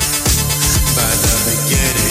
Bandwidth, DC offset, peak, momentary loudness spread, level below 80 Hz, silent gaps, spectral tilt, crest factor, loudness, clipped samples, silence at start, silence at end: 16.5 kHz; under 0.1%; -2 dBFS; 1 LU; -22 dBFS; none; -2.5 dB/octave; 12 dB; -13 LUFS; under 0.1%; 0 s; 0 s